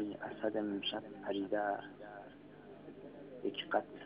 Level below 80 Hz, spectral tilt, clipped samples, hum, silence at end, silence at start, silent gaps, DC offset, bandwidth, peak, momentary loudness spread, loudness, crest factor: -78 dBFS; -2.5 dB/octave; under 0.1%; 50 Hz at -65 dBFS; 0 s; 0 s; none; under 0.1%; 5 kHz; -20 dBFS; 17 LU; -39 LUFS; 22 dB